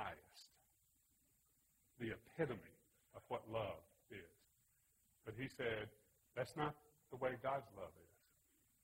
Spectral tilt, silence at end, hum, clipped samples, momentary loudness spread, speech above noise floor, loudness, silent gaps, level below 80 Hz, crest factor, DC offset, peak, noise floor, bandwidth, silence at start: -6 dB/octave; 0.8 s; none; under 0.1%; 19 LU; 32 dB; -48 LUFS; none; -76 dBFS; 24 dB; under 0.1%; -26 dBFS; -79 dBFS; 16 kHz; 0 s